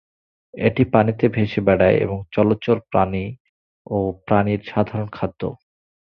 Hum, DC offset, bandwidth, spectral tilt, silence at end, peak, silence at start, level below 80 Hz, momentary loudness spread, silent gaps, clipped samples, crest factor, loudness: none; under 0.1%; 5.6 kHz; -10 dB/octave; 0.55 s; -2 dBFS; 0.55 s; -44 dBFS; 10 LU; 3.40-3.85 s; under 0.1%; 18 dB; -20 LUFS